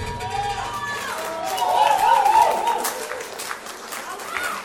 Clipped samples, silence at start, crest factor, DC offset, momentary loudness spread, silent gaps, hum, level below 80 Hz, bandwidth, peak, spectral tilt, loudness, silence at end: under 0.1%; 0 s; 18 dB; under 0.1%; 14 LU; none; none; -48 dBFS; 17.5 kHz; -4 dBFS; -2 dB/octave; -22 LUFS; 0 s